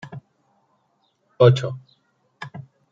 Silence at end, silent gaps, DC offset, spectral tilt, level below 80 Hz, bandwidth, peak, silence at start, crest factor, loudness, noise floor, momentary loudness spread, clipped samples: 0.3 s; none; under 0.1%; -7.5 dB/octave; -62 dBFS; 7.6 kHz; -2 dBFS; 0.05 s; 22 dB; -18 LUFS; -67 dBFS; 25 LU; under 0.1%